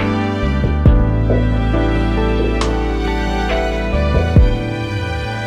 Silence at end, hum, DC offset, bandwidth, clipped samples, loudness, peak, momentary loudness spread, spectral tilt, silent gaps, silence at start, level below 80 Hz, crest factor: 0 s; none; under 0.1%; 9.4 kHz; under 0.1%; -17 LUFS; 0 dBFS; 7 LU; -7.5 dB/octave; none; 0 s; -18 dBFS; 14 dB